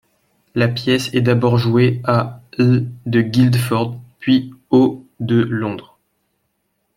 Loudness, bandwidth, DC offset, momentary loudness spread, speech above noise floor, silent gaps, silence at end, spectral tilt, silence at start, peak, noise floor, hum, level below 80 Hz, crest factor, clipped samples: -17 LUFS; 15.5 kHz; under 0.1%; 11 LU; 54 dB; none; 1.15 s; -7 dB/octave; 0.55 s; -2 dBFS; -69 dBFS; none; -54 dBFS; 16 dB; under 0.1%